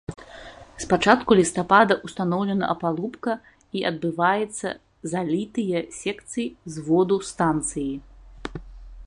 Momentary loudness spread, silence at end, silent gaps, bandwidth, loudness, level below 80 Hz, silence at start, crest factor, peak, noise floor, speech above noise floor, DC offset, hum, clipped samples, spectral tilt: 19 LU; 0 s; none; 11.5 kHz; -23 LUFS; -50 dBFS; 0.1 s; 22 dB; -2 dBFS; -43 dBFS; 20 dB; under 0.1%; none; under 0.1%; -5 dB/octave